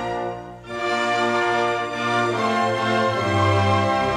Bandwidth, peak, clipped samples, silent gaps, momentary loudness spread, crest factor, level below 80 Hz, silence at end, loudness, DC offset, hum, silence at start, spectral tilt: 11.5 kHz; -8 dBFS; under 0.1%; none; 9 LU; 14 dB; -54 dBFS; 0 s; -21 LUFS; under 0.1%; none; 0 s; -5.5 dB/octave